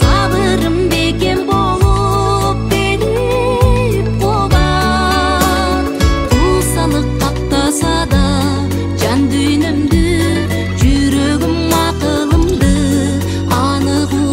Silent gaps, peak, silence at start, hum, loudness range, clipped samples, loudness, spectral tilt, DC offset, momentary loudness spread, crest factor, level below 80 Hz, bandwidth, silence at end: none; 0 dBFS; 0 s; none; 1 LU; under 0.1%; -13 LUFS; -5.5 dB/octave; under 0.1%; 3 LU; 12 dB; -20 dBFS; 16.5 kHz; 0 s